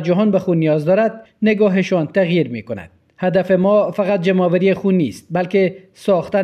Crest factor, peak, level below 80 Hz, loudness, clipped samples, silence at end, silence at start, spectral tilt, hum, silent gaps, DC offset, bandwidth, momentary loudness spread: 14 dB; -4 dBFS; -58 dBFS; -17 LUFS; under 0.1%; 0 s; 0 s; -8 dB/octave; none; none; under 0.1%; 11 kHz; 8 LU